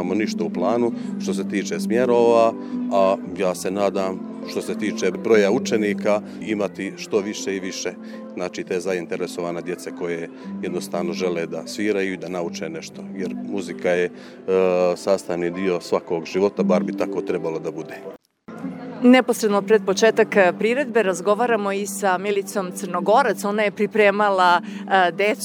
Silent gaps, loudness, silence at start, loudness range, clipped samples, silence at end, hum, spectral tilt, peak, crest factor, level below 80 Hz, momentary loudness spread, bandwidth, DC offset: none; -21 LUFS; 0 s; 8 LU; under 0.1%; 0 s; none; -5 dB/octave; -2 dBFS; 20 dB; -70 dBFS; 13 LU; 17.5 kHz; under 0.1%